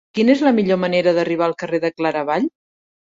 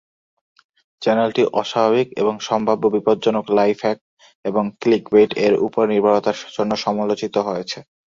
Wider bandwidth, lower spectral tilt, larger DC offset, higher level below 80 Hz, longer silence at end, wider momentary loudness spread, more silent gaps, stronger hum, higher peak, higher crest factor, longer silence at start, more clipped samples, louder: about the same, 7.8 kHz vs 7.4 kHz; about the same, -6.5 dB/octave vs -5.5 dB/octave; neither; about the same, -64 dBFS vs -60 dBFS; first, 0.55 s vs 0.4 s; about the same, 7 LU vs 8 LU; second, none vs 4.01-4.17 s, 4.35-4.43 s; neither; about the same, -2 dBFS vs -2 dBFS; about the same, 16 dB vs 18 dB; second, 0.15 s vs 1 s; neither; about the same, -18 LUFS vs -19 LUFS